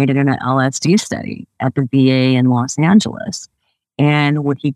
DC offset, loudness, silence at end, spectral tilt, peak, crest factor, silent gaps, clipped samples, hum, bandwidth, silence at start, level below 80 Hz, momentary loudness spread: under 0.1%; -15 LUFS; 0 s; -6 dB/octave; 0 dBFS; 14 dB; none; under 0.1%; none; 12 kHz; 0 s; -58 dBFS; 13 LU